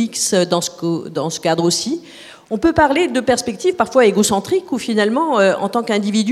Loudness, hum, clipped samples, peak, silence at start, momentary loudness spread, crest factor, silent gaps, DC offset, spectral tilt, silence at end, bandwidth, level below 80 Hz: -17 LUFS; none; under 0.1%; 0 dBFS; 0 s; 8 LU; 16 dB; none; under 0.1%; -4 dB/octave; 0 s; 15 kHz; -48 dBFS